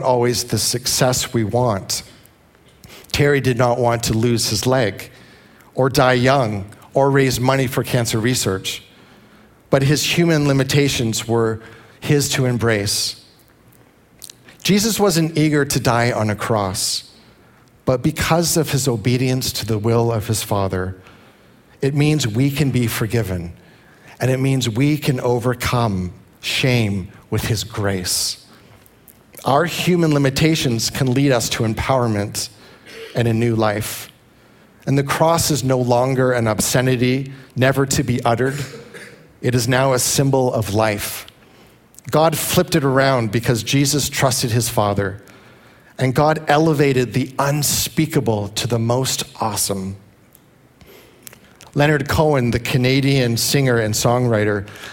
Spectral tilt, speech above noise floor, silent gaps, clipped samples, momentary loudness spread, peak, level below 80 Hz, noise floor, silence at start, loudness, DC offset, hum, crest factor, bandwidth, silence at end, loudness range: -4.5 dB/octave; 33 dB; none; under 0.1%; 10 LU; 0 dBFS; -46 dBFS; -51 dBFS; 0 s; -18 LUFS; under 0.1%; none; 18 dB; 17 kHz; 0 s; 4 LU